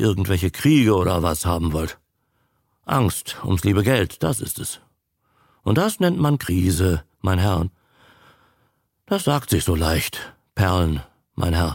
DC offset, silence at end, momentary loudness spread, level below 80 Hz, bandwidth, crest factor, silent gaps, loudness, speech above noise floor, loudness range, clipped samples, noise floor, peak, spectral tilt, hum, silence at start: under 0.1%; 0 s; 11 LU; -36 dBFS; 17 kHz; 18 dB; none; -21 LUFS; 49 dB; 2 LU; under 0.1%; -69 dBFS; -4 dBFS; -5.5 dB/octave; none; 0 s